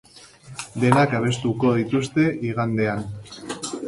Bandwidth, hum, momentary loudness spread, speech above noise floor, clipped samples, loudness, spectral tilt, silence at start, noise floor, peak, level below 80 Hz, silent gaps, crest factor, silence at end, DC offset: 11.5 kHz; none; 16 LU; 24 dB; under 0.1%; -22 LUFS; -6 dB/octave; 0.15 s; -45 dBFS; -2 dBFS; -54 dBFS; none; 22 dB; 0 s; under 0.1%